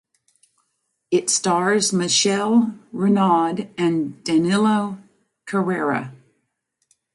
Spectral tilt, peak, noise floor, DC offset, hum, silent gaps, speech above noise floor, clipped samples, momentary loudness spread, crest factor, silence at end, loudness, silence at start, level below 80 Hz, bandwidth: -4 dB/octave; -6 dBFS; -73 dBFS; under 0.1%; none; none; 54 dB; under 0.1%; 9 LU; 16 dB; 1 s; -20 LUFS; 1.1 s; -68 dBFS; 11.5 kHz